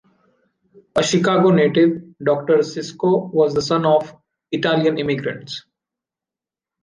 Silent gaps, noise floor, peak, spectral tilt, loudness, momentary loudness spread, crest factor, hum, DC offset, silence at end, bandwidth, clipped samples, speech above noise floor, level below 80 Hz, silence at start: none; -89 dBFS; -4 dBFS; -5.5 dB/octave; -18 LUFS; 13 LU; 16 dB; none; under 0.1%; 1.25 s; 10 kHz; under 0.1%; 71 dB; -58 dBFS; 0.95 s